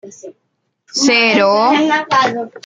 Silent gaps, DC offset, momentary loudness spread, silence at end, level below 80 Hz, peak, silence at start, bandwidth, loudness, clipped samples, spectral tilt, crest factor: none; under 0.1%; 6 LU; 0.05 s; -64 dBFS; 0 dBFS; 0.05 s; 9.4 kHz; -12 LUFS; under 0.1%; -2.5 dB/octave; 14 dB